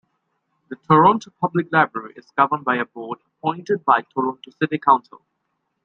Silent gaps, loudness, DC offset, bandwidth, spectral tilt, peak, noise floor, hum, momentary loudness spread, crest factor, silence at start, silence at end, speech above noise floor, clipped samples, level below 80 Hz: none; -20 LUFS; under 0.1%; 7.4 kHz; -7 dB/octave; -2 dBFS; -74 dBFS; none; 16 LU; 20 dB; 0.7 s; 0.85 s; 54 dB; under 0.1%; -68 dBFS